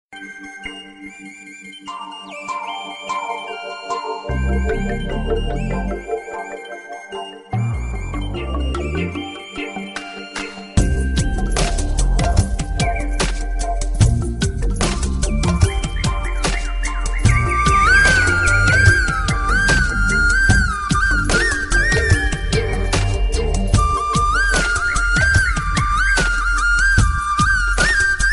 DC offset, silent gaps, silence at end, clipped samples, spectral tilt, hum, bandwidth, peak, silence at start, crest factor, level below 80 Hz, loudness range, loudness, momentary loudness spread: under 0.1%; none; 0 s; under 0.1%; -4 dB/octave; none; 11.5 kHz; 0 dBFS; 0.1 s; 18 dB; -22 dBFS; 11 LU; -18 LUFS; 16 LU